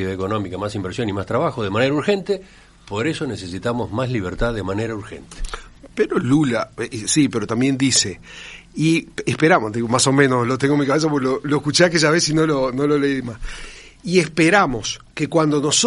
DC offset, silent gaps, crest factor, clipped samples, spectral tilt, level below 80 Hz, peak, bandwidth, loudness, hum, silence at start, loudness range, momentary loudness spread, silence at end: under 0.1%; none; 18 dB; under 0.1%; -4.5 dB/octave; -40 dBFS; 0 dBFS; 11.5 kHz; -19 LUFS; none; 0 s; 7 LU; 17 LU; 0 s